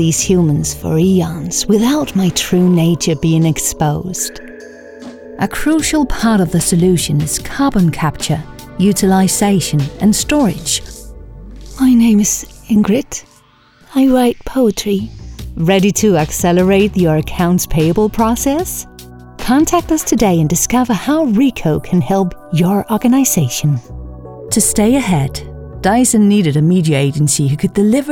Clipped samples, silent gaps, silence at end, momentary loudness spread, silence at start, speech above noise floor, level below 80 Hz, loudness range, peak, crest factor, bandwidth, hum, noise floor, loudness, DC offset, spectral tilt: under 0.1%; none; 0 s; 10 LU; 0 s; 35 dB; -32 dBFS; 3 LU; 0 dBFS; 14 dB; 18 kHz; none; -48 dBFS; -13 LUFS; under 0.1%; -5 dB/octave